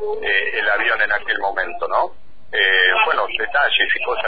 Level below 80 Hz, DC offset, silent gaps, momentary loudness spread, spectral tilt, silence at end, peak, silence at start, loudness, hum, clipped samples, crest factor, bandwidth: -50 dBFS; 3%; none; 8 LU; -4 dB/octave; 0 s; -2 dBFS; 0 s; -17 LUFS; none; under 0.1%; 16 dB; 5 kHz